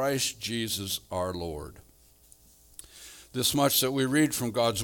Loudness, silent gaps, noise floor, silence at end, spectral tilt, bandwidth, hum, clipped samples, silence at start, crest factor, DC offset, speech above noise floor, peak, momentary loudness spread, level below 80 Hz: -28 LUFS; none; -58 dBFS; 0 s; -3.5 dB/octave; 19 kHz; none; under 0.1%; 0 s; 18 dB; under 0.1%; 30 dB; -12 dBFS; 23 LU; -58 dBFS